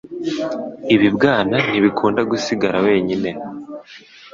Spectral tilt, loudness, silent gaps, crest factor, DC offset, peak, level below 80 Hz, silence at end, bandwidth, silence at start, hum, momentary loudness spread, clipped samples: -6 dB/octave; -17 LUFS; none; 16 dB; under 0.1%; -2 dBFS; -54 dBFS; 0.05 s; 7.6 kHz; 0.05 s; none; 15 LU; under 0.1%